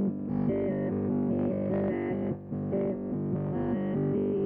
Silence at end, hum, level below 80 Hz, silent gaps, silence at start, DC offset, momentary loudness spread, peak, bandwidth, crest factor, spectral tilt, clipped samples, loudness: 0 s; none; -56 dBFS; none; 0 s; under 0.1%; 4 LU; -18 dBFS; 3.3 kHz; 12 dB; -12.5 dB/octave; under 0.1%; -30 LUFS